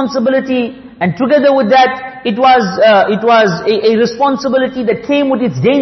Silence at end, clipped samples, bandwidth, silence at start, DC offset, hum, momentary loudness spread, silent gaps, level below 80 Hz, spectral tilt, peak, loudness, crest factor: 0 s; under 0.1%; 6.2 kHz; 0 s; under 0.1%; none; 8 LU; none; -52 dBFS; -6 dB/octave; 0 dBFS; -11 LUFS; 10 dB